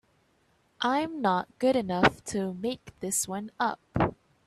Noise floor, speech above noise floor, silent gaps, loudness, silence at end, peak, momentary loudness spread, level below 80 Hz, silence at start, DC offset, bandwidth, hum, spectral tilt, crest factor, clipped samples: -68 dBFS; 40 dB; none; -29 LUFS; 0.35 s; -6 dBFS; 8 LU; -54 dBFS; 0.8 s; under 0.1%; 15 kHz; none; -4 dB/octave; 24 dB; under 0.1%